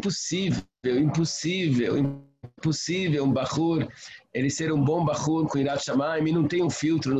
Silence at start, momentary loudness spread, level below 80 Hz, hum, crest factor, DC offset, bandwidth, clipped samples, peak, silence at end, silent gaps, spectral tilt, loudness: 0 s; 5 LU; -56 dBFS; none; 12 dB; under 0.1%; 8.8 kHz; under 0.1%; -14 dBFS; 0 s; none; -5.5 dB/octave; -26 LUFS